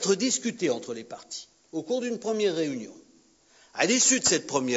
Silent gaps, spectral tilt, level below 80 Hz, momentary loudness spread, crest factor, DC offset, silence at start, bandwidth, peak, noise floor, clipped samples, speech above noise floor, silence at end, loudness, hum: none; -2 dB/octave; -70 dBFS; 19 LU; 20 dB; under 0.1%; 0 s; 8 kHz; -8 dBFS; -60 dBFS; under 0.1%; 33 dB; 0 s; -25 LUFS; none